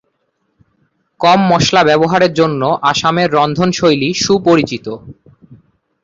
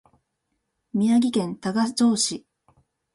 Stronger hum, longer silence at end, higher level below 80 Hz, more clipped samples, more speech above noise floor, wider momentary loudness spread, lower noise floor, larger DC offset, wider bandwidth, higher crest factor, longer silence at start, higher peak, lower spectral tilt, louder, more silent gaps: neither; second, 0.5 s vs 0.75 s; first, -48 dBFS vs -68 dBFS; neither; about the same, 53 dB vs 55 dB; second, 5 LU vs 8 LU; second, -65 dBFS vs -77 dBFS; neither; second, 7.8 kHz vs 11.5 kHz; about the same, 12 dB vs 14 dB; first, 1.2 s vs 0.95 s; first, 0 dBFS vs -10 dBFS; about the same, -5 dB/octave vs -4 dB/octave; first, -12 LUFS vs -23 LUFS; neither